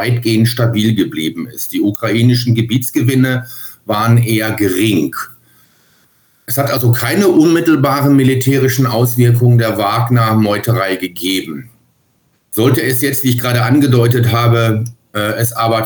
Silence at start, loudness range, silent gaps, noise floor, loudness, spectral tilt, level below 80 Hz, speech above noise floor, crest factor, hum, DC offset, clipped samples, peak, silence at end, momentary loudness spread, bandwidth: 0 s; 4 LU; none; -58 dBFS; -13 LUFS; -6 dB/octave; -54 dBFS; 46 dB; 12 dB; none; under 0.1%; under 0.1%; 0 dBFS; 0 s; 9 LU; over 20 kHz